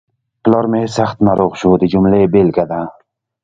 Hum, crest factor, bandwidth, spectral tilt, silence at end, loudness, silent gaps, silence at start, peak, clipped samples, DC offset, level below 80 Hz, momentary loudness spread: none; 14 dB; 7.6 kHz; -8 dB/octave; 0.55 s; -13 LUFS; none; 0.45 s; 0 dBFS; under 0.1%; under 0.1%; -42 dBFS; 8 LU